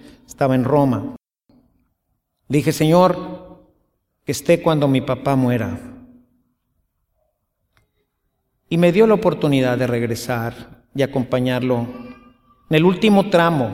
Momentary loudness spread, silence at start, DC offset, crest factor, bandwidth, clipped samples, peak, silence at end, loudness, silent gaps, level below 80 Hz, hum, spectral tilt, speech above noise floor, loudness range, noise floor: 14 LU; 0.3 s; under 0.1%; 18 dB; 16.5 kHz; under 0.1%; -2 dBFS; 0 s; -18 LUFS; none; -52 dBFS; none; -6.5 dB/octave; 55 dB; 5 LU; -72 dBFS